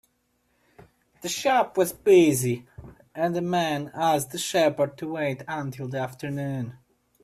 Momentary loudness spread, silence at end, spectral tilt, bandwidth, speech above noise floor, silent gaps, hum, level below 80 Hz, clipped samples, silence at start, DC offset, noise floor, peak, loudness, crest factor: 14 LU; 0.5 s; -5 dB/octave; 15.5 kHz; 46 dB; none; none; -62 dBFS; under 0.1%; 1.2 s; under 0.1%; -71 dBFS; -8 dBFS; -25 LUFS; 18 dB